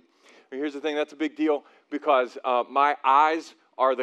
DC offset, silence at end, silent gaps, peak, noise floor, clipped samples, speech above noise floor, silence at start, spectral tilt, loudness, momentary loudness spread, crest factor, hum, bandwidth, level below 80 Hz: under 0.1%; 0 s; none; -8 dBFS; -57 dBFS; under 0.1%; 33 dB; 0.5 s; -3 dB/octave; -25 LUFS; 13 LU; 18 dB; none; 9.4 kHz; under -90 dBFS